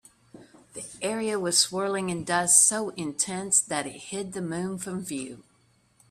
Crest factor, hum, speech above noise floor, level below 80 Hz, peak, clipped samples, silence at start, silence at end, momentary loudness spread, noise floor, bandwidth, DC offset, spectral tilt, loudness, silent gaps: 22 dB; none; 38 dB; -66 dBFS; -6 dBFS; under 0.1%; 0.35 s; 0.7 s; 17 LU; -65 dBFS; 15.5 kHz; under 0.1%; -2 dB/octave; -25 LUFS; none